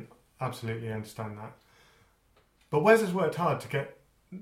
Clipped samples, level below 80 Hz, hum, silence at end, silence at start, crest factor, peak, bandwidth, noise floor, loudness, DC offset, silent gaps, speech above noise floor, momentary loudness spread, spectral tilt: under 0.1%; -66 dBFS; none; 0 s; 0 s; 24 dB; -6 dBFS; 16 kHz; -66 dBFS; -29 LUFS; under 0.1%; none; 38 dB; 21 LU; -6 dB/octave